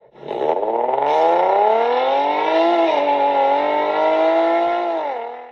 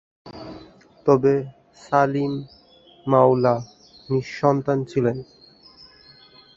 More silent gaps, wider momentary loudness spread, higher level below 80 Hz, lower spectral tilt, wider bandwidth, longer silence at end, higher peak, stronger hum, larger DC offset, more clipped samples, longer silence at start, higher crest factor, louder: neither; second, 7 LU vs 22 LU; second, -64 dBFS vs -58 dBFS; second, -5 dB/octave vs -8 dB/octave; second, 6.8 kHz vs 7.6 kHz; second, 0 s vs 1.35 s; about the same, -4 dBFS vs -2 dBFS; neither; neither; neither; about the same, 0.2 s vs 0.25 s; second, 14 dB vs 20 dB; first, -17 LUFS vs -21 LUFS